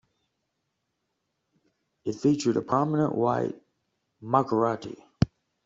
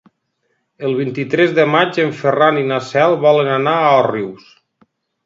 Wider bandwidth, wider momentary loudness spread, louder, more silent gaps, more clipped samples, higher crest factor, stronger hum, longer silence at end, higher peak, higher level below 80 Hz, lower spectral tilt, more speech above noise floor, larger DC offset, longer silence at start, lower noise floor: about the same, 7.8 kHz vs 7.8 kHz; first, 13 LU vs 8 LU; second, -27 LUFS vs -15 LUFS; neither; neither; first, 22 dB vs 16 dB; neither; second, 0.4 s vs 0.9 s; second, -6 dBFS vs 0 dBFS; first, -56 dBFS vs -66 dBFS; about the same, -7 dB/octave vs -6.5 dB/octave; about the same, 54 dB vs 53 dB; neither; first, 2.05 s vs 0.8 s; first, -80 dBFS vs -68 dBFS